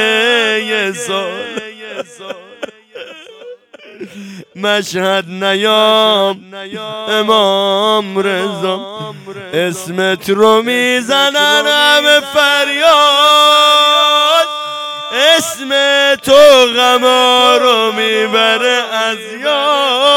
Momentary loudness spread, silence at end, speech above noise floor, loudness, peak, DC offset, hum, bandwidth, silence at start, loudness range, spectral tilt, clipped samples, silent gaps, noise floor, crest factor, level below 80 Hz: 19 LU; 0 s; 24 dB; -10 LUFS; 0 dBFS; under 0.1%; none; 18.5 kHz; 0 s; 12 LU; -2 dB/octave; 0.7%; none; -36 dBFS; 12 dB; -58 dBFS